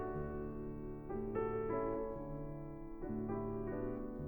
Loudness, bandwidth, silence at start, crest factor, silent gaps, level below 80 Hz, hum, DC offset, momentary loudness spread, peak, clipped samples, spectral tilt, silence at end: -43 LUFS; 19 kHz; 0 s; 14 dB; none; -52 dBFS; none; under 0.1%; 9 LU; -26 dBFS; under 0.1%; -11.5 dB/octave; 0 s